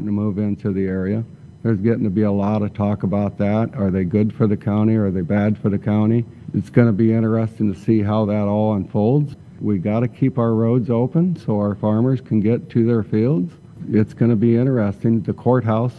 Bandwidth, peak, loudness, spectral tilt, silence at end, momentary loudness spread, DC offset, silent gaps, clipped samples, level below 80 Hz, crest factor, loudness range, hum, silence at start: 4.6 kHz; -2 dBFS; -19 LUFS; -10.5 dB/octave; 0 s; 5 LU; under 0.1%; none; under 0.1%; -54 dBFS; 18 dB; 2 LU; none; 0 s